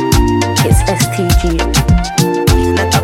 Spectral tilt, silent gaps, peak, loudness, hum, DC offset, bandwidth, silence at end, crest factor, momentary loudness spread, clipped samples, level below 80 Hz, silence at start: -5 dB/octave; none; 0 dBFS; -12 LUFS; none; under 0.1%; 17 kHz; 0 s; 12 dB; 2 LU; under 0.1%; -18 dBFS; 0 s